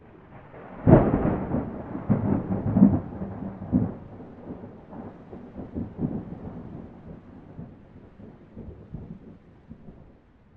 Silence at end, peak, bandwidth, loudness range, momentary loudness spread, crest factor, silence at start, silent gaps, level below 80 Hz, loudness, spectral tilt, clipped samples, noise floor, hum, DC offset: 0.55 s; -2 dBFS; 3.5 kHz; 21 LU; 26 LU; 26 dB; 0.3 s; none; -44 dBFS; -25 LUFS; -13 dB/octave; under 0.1%; -54 dBFS; none; under 0.1%